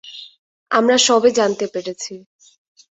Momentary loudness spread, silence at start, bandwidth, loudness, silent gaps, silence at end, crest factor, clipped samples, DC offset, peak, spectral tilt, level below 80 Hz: 19 LU; 0.05 s; 8.4 kHz; -16 LUFS; 0.39-0.66 s; 0.8 s; 18 dB; under 0.1%; under 0.1%; -2 dBFS; -2 dB/octave; -64 dBFS